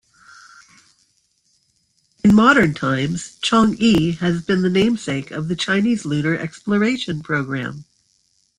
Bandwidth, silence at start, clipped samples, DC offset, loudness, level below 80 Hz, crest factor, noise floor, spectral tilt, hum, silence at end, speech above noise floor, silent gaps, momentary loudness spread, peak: 11 kHz; 2.25 s; under 0.1%; under 0.1%; -18 LUFS; -50 dBFS; 18 dB; -64 dBFS; -5.5 dB/octave; none; 0.75 s; 47 dB; none; 12 LU; -2 dBFS